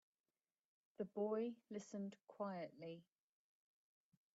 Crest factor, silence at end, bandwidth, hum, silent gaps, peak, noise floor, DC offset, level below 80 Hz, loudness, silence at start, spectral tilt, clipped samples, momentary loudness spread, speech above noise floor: 18 dB; 1.35 s; 7.6 kHz; none; none; -34 dBFS; under -90 dBFS; under 0.1%; under -90 dBFS; -49 LUFS; 1 s; -7 dB/octave; under 0.1%; 12 LU; over 42 dB